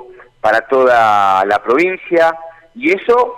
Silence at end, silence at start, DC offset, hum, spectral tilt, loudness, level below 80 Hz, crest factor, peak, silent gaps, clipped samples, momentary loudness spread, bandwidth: 0 s; 0 s; under 0.1%; none; -5 dB/octave; -13 LUFS; -54 dBFS; 10 dB; -4 dBFS; none; under 0.1%; 7 LU; 14 kHz